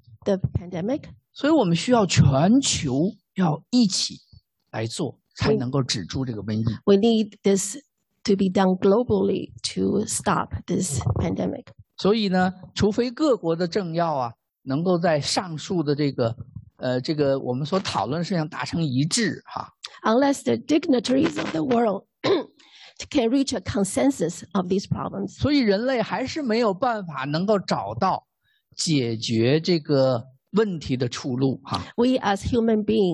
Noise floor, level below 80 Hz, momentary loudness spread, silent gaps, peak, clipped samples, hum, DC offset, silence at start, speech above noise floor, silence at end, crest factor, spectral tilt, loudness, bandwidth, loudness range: -50 dBFS; -48 dBFS; 9 LU; none; -6 dBFS; under 0.1%; none; under 0.1%; 0.1 s; 28 dB; 0 s; 18 dB; -5.5 dB/octave; -23 LUFS; 12.5 kHz; 3 LU